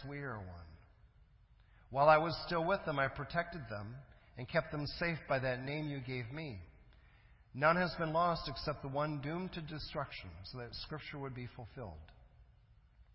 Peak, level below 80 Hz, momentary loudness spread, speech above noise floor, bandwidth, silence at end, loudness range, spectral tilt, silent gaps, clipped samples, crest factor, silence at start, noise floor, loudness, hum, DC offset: -14 dBFS; -58 dBFS; 18 LU; 28 dB; 5.8 kHz; 0.15 s; 9 LU; -9 dB/octave; none; under 0.1%; 24 dB; 0 s; -65 dBFS; -37 LUFS; none; under 0.1%